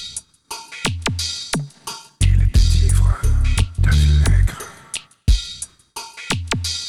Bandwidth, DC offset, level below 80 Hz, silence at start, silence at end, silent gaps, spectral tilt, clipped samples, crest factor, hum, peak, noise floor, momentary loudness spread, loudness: 13 kHz; under 0.1%; -20 dBFS; 0 s; 0 s; none; -4 dB/octave; under 0.1%; 14 dB; none; -4 dBFS; -37 dBFS; 16 LU; -19 LUFS